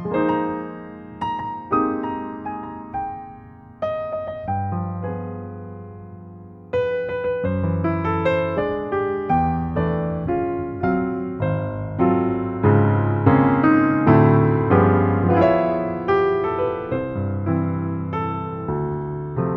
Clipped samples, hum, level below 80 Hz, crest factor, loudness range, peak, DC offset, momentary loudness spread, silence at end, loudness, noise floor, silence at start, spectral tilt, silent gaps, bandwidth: under 0.1%; none; -44 dBFS; 20 dB; 11 LU; -2 dBFS; under 0.1%; 15 LU; 0 s; -21 LUFS; -42 dBFS; 0 s; -10.5 dB/octave; none; 5.4 kHz